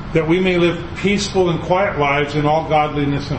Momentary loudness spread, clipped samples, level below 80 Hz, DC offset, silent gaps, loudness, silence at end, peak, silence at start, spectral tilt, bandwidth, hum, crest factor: 3 LU; under 0.1%; -36 dBFS; under 0.1%; none; -17 LUFS; 0 s; -2 dBFS; 0 s; -6 dB/octave; 8.6 kHz; none; 14 dB